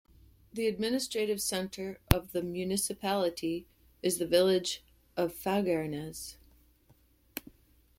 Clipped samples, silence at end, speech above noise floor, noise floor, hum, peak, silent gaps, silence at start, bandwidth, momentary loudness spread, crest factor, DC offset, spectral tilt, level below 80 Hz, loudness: under 0.1%; 0.6 s; 34 dB; -65 dBFS; none; -2 dBFS; none; 0.55 s; 16.5 kHz; 15 LU; 32 dB; under 0.1%; -4.5 dB/octave; -50 dBFS; -32 LUFS